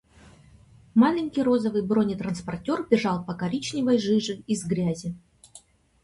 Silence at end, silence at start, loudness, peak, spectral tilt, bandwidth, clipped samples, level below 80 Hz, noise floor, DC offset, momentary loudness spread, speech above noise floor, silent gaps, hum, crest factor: 0.45 s; 0.95 s; -25 LUFS; -6 dBFS; -6 dB/octave; 11.5 kHz; under 0.1%; -58 dBFS; -54 dBFS; under 0.1%; 9 LU; 29 dB; none; none; 20 dB